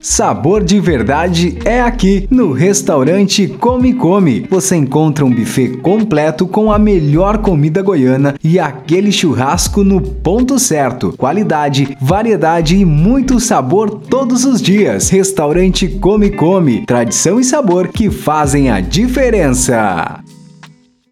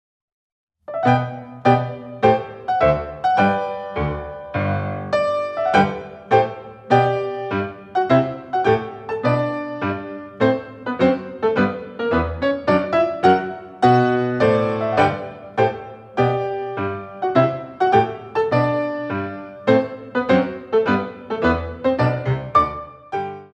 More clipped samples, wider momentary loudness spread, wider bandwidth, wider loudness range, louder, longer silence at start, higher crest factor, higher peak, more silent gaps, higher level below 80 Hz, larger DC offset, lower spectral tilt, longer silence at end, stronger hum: neither; second, 4 LU vs 10 LU; first, 15.5 kHz vs 8.8 kHz; about the same, 1 LU vs 3 LU; first, -11 LUFS vs -20 LUFS; second, 0.05 s vs 0.9 s; second, 10 dB vs 18 dB; about the same, 0 dBFS vs -2 dBFS; neither; first, -26 dBFS vs -44 dBFS; neither; second, -5 dB/octave vs -8 dB/octave; first, 0.9 s vs 0.1 s; neither